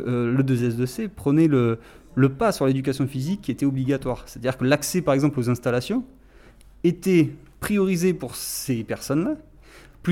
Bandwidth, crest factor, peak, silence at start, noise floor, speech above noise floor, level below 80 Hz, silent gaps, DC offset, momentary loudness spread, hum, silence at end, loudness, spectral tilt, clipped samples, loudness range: 17 kHz; 16 dB; -6 dBFS; 0 s; -49 dBFS; 27 dB; -50 dBFS; none; under 0.1%; 9 LU; none; 0 s; -23 LUFS; -6.5 dB/octave; under 0.1%; 2 LU